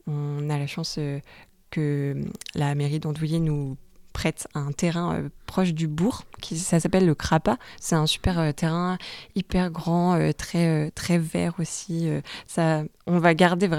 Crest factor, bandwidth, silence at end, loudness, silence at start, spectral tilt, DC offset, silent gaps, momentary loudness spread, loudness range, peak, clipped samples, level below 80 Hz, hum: 22 dB; 14.5 kHz; 0 s; -25 LUFS; 0.05 s; -6 dB/octave; under 0.1%; none; 10 LU; 4 LU; -4 dBFS; under 0.1%; -44 dBFS; none